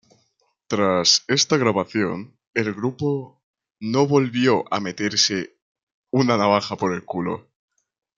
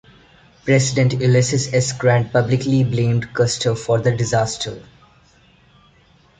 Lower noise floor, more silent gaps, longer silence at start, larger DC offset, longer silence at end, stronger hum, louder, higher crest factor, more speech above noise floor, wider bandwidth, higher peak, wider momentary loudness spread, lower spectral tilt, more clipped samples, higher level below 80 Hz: first, -68 dBFS vs -53 dBFS; first, 2.47-2.54 s, 3.43-3.54 s, 5.62-5.75 s, 5.83-6.04 s vs none; about the same, 0.7 s vs 0.65 s; neither; second, 0.75 s vs 1.6 s; neither; second, -21 LUFS vs -18 LUFS; about the same, 20 dB vs 16 dB; first, 48 dB vs 36 dB; first, 11 kHz vs 9.4 kHz; about the same, -2 dBFS vs -2 dBFS; first, 11 LU vs 6 LU; second, -4 dB/octave vs -5.5 dB/octave; neither; second, -66 dBFS vs -48 dBFS